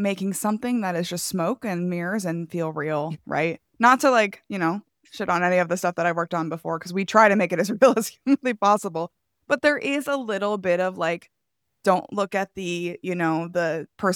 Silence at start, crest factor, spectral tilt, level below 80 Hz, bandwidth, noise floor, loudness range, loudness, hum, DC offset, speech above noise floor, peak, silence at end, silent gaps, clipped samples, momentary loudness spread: 0 s; 20 dB; -5 dB/octave; -68 dBFS; 18.5 kHz; -80 dBFS; 5 LU; -23 LUFS; none; under 0.1%; 57 dB; -2 dBFS; 0 s; none; under 0.1%; 10 LU